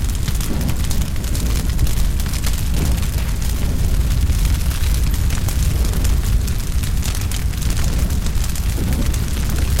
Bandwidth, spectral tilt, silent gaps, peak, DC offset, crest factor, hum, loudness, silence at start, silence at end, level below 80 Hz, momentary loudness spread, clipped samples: 17 kHz; -5 dB/octave; none; -6 dBFS; 0.8%; 12 dB; none; -20 LUFS; 0 s; 0 s; -18 dBFS; 3 LU; under 0.1%